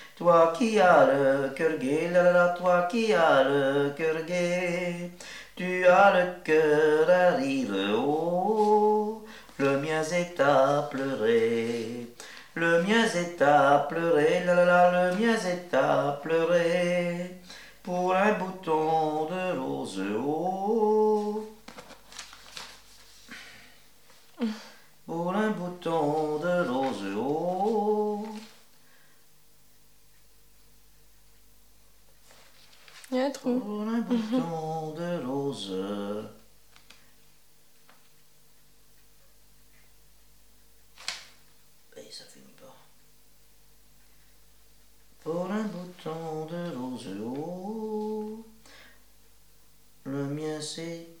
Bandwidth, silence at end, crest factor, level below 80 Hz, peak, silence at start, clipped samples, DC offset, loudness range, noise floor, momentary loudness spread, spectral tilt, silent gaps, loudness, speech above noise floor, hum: 17 kHz; 0.15 s; 20 dB; -68 dBFS; -8 dBFS; 0 s; under 0.1%; 0.2%; 18 LU; -62 dBFS; 20 LU; -5.5 dB/octave; none; -26 LUFS; 37 dB; 50 Hz at -70 dBFS